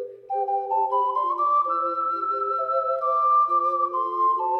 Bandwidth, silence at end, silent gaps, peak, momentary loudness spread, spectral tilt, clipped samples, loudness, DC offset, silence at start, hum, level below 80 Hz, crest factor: 5.8 kHz; 0 s; none; -14 dBFS; 6 LU; -6 dB/octave; under 0.1%; -23 LUFS; under 0.1%; 0 s; none; -80 dBFS; 10 dB